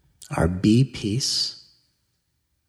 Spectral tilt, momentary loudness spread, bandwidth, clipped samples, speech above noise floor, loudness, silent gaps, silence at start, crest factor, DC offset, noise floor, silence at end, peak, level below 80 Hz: -5 dB/octave; 7 LU; 13 kHz; under 0.1%; 51 dB; -22 LUFS; none; 0.2 s; 18 dB; under 0.1%; -73 dBFS; 1.1 s; -6 dBFS; -44 dBFS